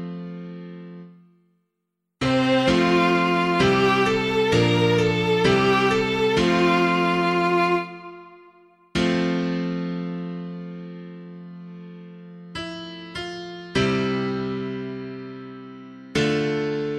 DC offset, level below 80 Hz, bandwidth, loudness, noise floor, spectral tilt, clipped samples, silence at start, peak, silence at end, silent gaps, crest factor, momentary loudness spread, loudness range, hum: under 0.1%; -50 dBFS; 13 kHz; -21 LUFS; -78 dBFS; -6 dB/octave; under 0.1%; 0 s; -4 dBFS; 0 s; none; 18 dB; 21 LU; 12 LU; none